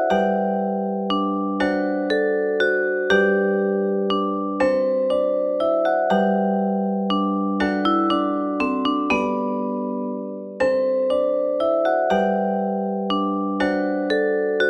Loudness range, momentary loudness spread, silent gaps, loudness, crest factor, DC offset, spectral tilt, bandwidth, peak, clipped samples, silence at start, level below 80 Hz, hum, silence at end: 2 LU; 5 LU; none; -21 LUFS; 16 dB; under 0.1%; -7 dB/octave; 9.2 kHz; -6 dBFS; under 0.1%; 0 s; -56 dBFS; none; 0 s